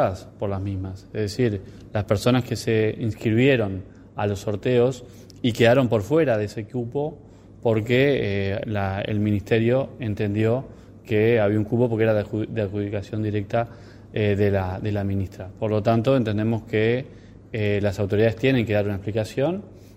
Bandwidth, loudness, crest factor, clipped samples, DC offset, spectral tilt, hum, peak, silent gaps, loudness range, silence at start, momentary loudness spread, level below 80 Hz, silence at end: 14.5 kHz; -23 LUFS; 18 dB; under 0.1%; under 0.1%; -7.5 dB/octave; none; -4 dBFS; none; 2 LU; 0 s; 10 LU; -50 dBFS; 0.1 s